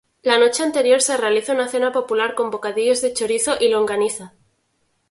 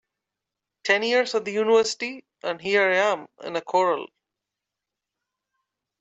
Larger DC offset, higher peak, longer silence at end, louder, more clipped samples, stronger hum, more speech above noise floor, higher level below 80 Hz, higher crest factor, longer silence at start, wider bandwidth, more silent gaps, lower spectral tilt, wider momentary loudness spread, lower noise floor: neither; first, 0 dBFS vs -8 dBFS; second, 0.85 s vs 1.95 s; first, -18 LUFS vs -23 LUFS; neither; neither; second, 49 dB vs 63 dB; first, -62 dBFS vs -74 dBFS; about the same, 18 dB vs 18 dB; second, 0.25 s vs 0.85 s; first, 11.5 kHz vs 8.2 kHz; neither; second, -1.5 dB/octave vs -3 dB/octave; second, 6 LU vs 12 LU; second, -67 dBFS vs -86 dBFS